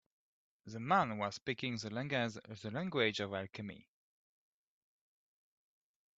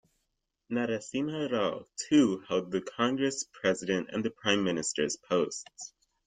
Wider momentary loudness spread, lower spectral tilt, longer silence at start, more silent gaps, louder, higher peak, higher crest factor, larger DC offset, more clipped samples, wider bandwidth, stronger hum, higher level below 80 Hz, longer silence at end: first, 15 LU vs 9 LU; about the same, -5 dB/octave vs -4 dB/octave; about the same, 0.65 s vs 0.7 s; first, 1.42-1.46 s vs none; second, -38 LUFS vs -30 LUFS; second, -18 dBFS vs -10 dBFS; about the same, 24 dB vs 22 dB; neither; neither; second, 8 kHz vs 9.6 kHz; neither; second, -76 dBFS vs -70 dBFS; first, 2.35 s vs 0.4 s